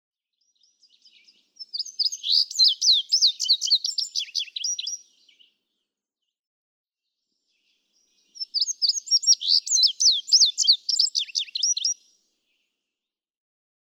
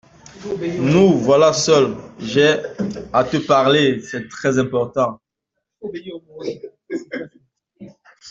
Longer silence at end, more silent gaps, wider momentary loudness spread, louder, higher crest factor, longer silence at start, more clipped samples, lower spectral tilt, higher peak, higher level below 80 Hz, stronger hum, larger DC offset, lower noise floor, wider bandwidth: first, 1.9 s vs 0 s; first, 6.39-6.84 s vs none; second, 13 LU vs 18 LU; second, -20 LUFS vs -17 LUFS; about the same, 18 dB vs 16 dB; first, 1.6 s vs 0.35 s; neither; second, 9 dB/octave vs -5 dB/octave; second, -8 dBFS vs -2 dBFS; second, under -90 dBFS vs -54 dBFS; neither; neither; first, -88 dBFS vs -79 dBFS; first, 18.5 kHz vs 8 kHz